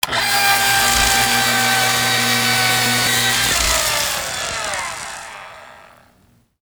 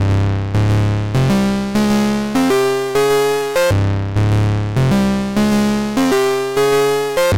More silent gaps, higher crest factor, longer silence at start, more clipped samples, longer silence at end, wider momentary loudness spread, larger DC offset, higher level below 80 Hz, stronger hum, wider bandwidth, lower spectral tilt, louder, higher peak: neither; first, 18 dB vs 6 dB; about the same, 0.05 s vs 0 s; neither; first, 1 s vs 0 s; first, 12 LU vs 3 LU; neither; second, -38 dBFS vs -32 dBFS; neither; first, over 20 kHz vs 16.5 kHz; second, -1 dB/octave vs -6 dB/octave; about the same, -15 LUFS vs -16 LUFS; first, -2 dBFS vs -8 dBFS